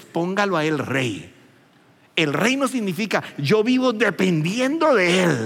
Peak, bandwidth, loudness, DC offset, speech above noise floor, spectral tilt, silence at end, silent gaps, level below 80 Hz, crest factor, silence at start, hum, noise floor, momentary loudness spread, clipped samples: -4 dBFS; 17 kHz; -20 LUFS; under 0.1%; 35 dB; -5 dB/octave; 0 s; none; -74 dBFS; 16 dB; 0 s; none; -55 dBFS; 7 LU; under 0.1%